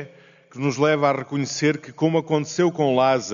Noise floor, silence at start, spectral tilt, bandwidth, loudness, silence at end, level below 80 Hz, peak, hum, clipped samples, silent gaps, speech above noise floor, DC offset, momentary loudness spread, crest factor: -48 dBFS; 0 s; -5 dB/octave; 7.4 kHz; -21 LUFS; 0 s; -66 dBFS; -6 dBFS; none; under 0.1%; none; 27 dB; under 0.1%; 7 LU; 16 dB